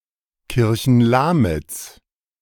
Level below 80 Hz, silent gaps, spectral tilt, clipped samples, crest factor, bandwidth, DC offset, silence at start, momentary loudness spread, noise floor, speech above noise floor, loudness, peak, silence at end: -40 dBFS; none; -6.5 dB/octave; under 0.1%; 16 dB; 18 kHz; under 0.1%; 0.5 s; 17 LU; -54 dBFS; 38 dB; -18 LUFS; -4 dBFS; 0.5 s